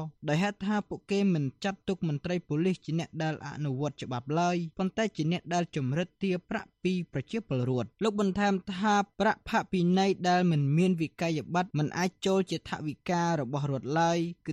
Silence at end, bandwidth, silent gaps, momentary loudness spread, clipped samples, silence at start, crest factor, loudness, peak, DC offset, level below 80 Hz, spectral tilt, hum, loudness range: 0 s; 10.5 kHz; none; 8 LU; under 0.1%; 0 s; 14 dB; -30 LUFS; -14 dBFS; under 0.1%; -62 dBFS; -6.5 dB/octave; none; 4 LU